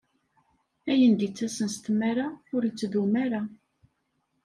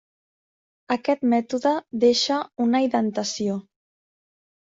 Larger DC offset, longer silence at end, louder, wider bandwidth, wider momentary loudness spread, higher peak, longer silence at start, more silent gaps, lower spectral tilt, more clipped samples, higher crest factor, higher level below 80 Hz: neither; second, 0.9 s vs 1.1 s; second, -27 LUFS vs -23 LUFS; first, 11.5 kHz vs 7.8 kHz; about the same, 10 LU vs 8 LU; second, -12 dBFS vs -8 dBFS; about the same, 0.85 s vs 0.9 s; neither; first, -5.5 dB/octave vs -4 dB/octave; neither; about the same, 16 dB vs 16 dB; about the same, -70 dBFS vs -68 dBFS